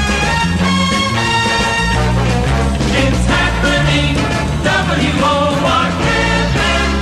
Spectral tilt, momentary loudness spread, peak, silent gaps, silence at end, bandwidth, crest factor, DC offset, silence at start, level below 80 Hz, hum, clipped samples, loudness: -4.5 dB/octave; 2 LU; -2 dBFS; none; 0 s; 13 kHz; 12 dB; under 0.1%; 0 s; -22 dBFS; none; under 0.1%; -13 LUFS